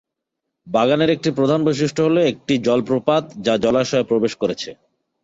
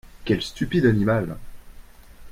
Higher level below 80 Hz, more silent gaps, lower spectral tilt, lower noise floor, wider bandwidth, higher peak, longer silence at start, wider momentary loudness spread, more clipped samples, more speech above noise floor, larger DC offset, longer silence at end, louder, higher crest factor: second, -56 dBFS vs -42 dBFS; neither; about the same, -6 dB/octave vs -7 dB/octave; first, -80 dBFS vs -44 dBFS; second, 8 kHz vs 16 kHz; about the same, -4 dBFS vs -6 dBFS; first, 0.65 s vs 0.05 s; second, 6 LU vs 12 LU; neither; first, 62 dB vs 22 dB; neither; first, 0.5 s vs 0 s; first, -18 LUFS vs -23 LUFS; about the same, 16 dB vs 18 dB